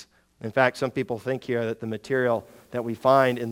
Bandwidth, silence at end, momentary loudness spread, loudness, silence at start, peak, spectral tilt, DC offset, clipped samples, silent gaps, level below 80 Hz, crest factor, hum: 17.5 kHz; 0 s; 12 LU; -25 LUFS; 0 s; -4 dBFS; -6.5 dB/octave; under 0.1%; under 0.1%; none; -66 dBFS; 22 dB; none